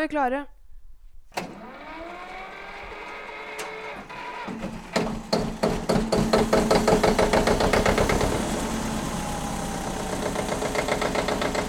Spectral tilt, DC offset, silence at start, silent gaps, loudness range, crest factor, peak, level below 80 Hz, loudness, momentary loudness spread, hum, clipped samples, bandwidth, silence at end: -4.5 dB/octave; under 0.1%; 0 s; none; 14 LU; 20 dB; -6 dBFS; -38 dBFS; -25 LUFS; 17 LU; none; under 0.1%; 18 kHz; 0 s